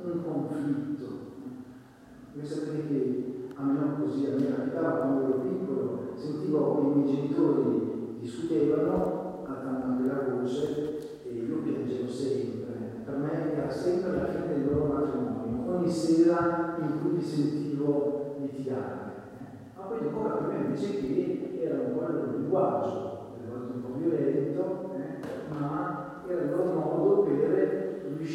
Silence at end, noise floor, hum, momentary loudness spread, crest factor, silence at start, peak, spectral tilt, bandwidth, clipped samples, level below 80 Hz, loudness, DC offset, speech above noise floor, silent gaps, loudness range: 0 s; -51 dBFS; none; 12 LU; 16 dB; 0 s; -12 dBFS; -8 dB/octave; 11.5 kHz; under 0.1%; -62 dBFS; -30 LUFS; under 0.1%; 22 dB; none; 5 LU